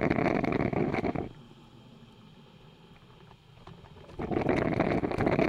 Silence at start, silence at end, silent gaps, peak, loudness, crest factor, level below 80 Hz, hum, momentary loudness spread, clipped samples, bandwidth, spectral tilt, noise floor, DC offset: 0 s; 0 s; none; -12 dBFS; -30 LUFS; 20 dB; -50 dBFS; none; 23 LU; under 0.1%; 11 kHz; -8 dB/octave; -54 dBFS; under 0.1%